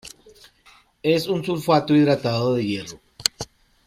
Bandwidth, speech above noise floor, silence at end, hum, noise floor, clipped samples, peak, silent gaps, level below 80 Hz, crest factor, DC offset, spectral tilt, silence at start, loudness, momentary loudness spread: 16 kHz; 35 dB; 0.4 s; none; -55 dBFS; under 0.1%; 0 dBFS; none; -58 dBFS; 22 dB; under 0.1%; -5 dB/octave; 0.05 s; -21 LUFS; 19 LU